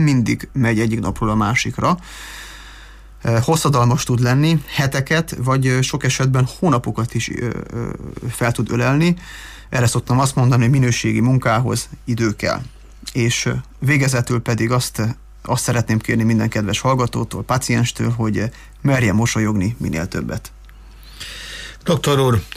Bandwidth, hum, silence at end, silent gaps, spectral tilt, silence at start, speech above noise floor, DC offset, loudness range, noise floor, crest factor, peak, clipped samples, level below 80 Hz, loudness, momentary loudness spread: 15.5 kHz; none; 0 s; none; -5.5 dB/octave; 0 s; 22 dB; under 0.1%; 3 LU; -40 dBFS; 12 dB; -6 dBFS; under 0.1%; -40 dBFS; -18 LUFS; 12 LU